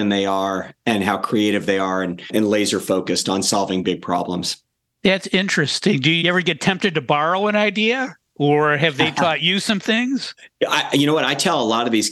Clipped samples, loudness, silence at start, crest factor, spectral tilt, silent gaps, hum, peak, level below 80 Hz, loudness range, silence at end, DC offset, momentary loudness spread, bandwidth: under 0.1%; -19 LUFS; 0 s; 16 dB; -4 dB/octave; none; none; -4 dBFS; -60 dBFS; 2 LU; 0 s; under 0.1%; 7 LU; 13 kHz